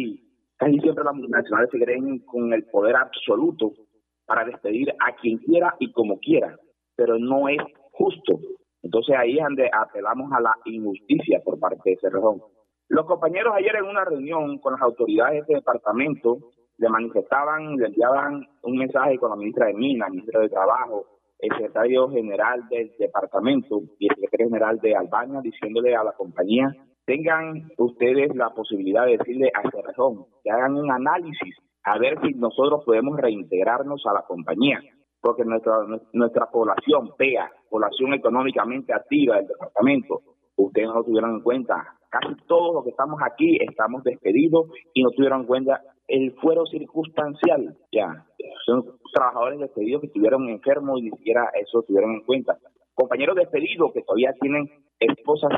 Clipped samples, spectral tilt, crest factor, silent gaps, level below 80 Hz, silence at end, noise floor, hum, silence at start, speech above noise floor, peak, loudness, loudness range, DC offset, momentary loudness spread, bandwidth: under 0.1%; -9 dB/octave; 16 dB; none; -74 dBFS; 0 s; -44 dBFS; none; 0 s; 22 dB; -6 dBFS; -22 LUFS; 2 LU; under 0.1%; 8 LU; 4 kHz